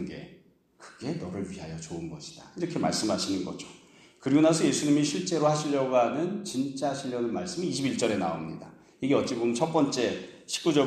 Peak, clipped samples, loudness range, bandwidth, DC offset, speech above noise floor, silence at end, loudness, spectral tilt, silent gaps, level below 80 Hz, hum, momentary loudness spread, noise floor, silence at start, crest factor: -10 dBFS; under 0.1%; 7 LU; 13 kHz; under 0.1%; 30 dB; 0 s; -28 LUFS; -5 dB/octave; none; -64 dBFS; none; 15 LU; -58 dBFS; 0 s; 18 dB